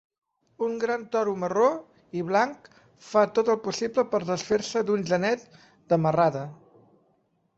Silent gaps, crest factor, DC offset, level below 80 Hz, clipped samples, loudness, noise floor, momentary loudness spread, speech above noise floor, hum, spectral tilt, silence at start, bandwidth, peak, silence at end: none; 18 dB; under 0.1%; -68 dBFS; under 0.1%; -26 LUFS; -69 dBFS; 9 LU; 44 dB; none; -5.5 dB/octave; 0.6 s; 8 kHz; -8 dBFS; 1.05 s